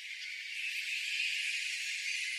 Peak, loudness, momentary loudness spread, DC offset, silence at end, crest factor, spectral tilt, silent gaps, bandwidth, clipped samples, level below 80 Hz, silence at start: -22 dBFS; -34 LUFS; 7 LU; under 0.1%; 0 s; 14 dB; 7 dB/octave; none; 15 kHz; under 0.1%; under -90 dBFS; 0 s